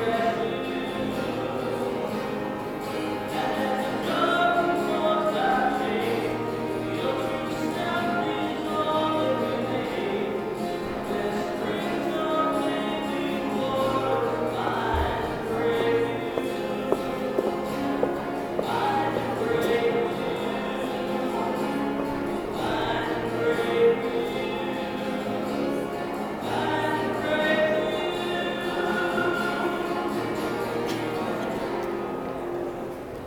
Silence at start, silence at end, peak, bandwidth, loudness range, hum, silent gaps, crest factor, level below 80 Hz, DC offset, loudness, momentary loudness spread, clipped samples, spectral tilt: 0 s; 0 s; -6 dBFS; 18 kHz; 3 LU; none; none; 20 dB; -50 dBFS; under 0.1%; -27 LUFS; 6 LU; under 0.1%; -5.5 dB/octave